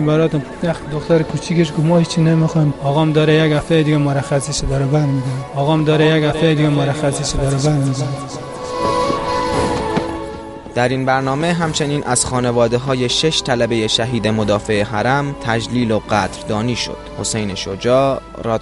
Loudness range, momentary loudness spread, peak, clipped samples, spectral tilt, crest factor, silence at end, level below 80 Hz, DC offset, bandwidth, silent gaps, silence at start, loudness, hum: 4 LU; 8 LU; -2 dBFS; under 0.1%; -5.5 dB/octave; 14 dB; 0 s; -36 dBFS; under 0.1%; 11.5 kHz; none; 0 s; -17 LUFS; none